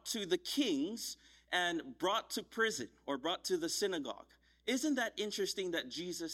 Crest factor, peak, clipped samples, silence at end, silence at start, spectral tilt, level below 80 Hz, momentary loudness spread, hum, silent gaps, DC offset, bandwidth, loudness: 18 dB; -20 dBFS; under 0.1%; 0 s; 0.05 s; -2.5 dB/octave; -74 dBFS; 8 LU; none; none; under 0.1%; 16 kHz; -37 LUFS